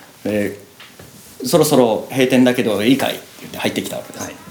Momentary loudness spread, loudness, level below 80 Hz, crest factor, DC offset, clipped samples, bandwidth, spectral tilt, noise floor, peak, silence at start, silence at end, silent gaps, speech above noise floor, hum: 16 LU; -17 LUFS; -58 dBFS; 18 dB; under 0.1%; under 0.1%; over 20 kHz; -4.5 dB/octave; -41 dBFS; 0 dBFS; 0.25 s; 0 s; none; 24 dB; none